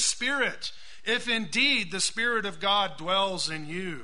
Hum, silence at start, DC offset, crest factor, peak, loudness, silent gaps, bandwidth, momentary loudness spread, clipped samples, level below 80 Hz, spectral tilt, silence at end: none; 0 s; 1%; 16 dB; -12 dBFS; -26 LUFS; none; 11 kHz; 11 LU; under 0.1%; -60 dBFS; -1.5 dB/octave; 0 s